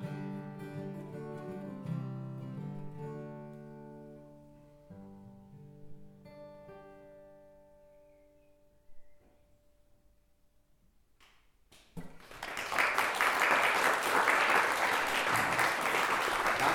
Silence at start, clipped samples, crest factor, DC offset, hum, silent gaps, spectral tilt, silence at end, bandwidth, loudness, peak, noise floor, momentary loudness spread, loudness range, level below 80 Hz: 0 s; under 0.1%; 24 dB; under 0.1%; none; none; -3 dB/octave; 0 s; 17 kHz; -31 LUFS; -12 dBFS; -68 dBFS; 25 LU; 26 LU; -64 dBFS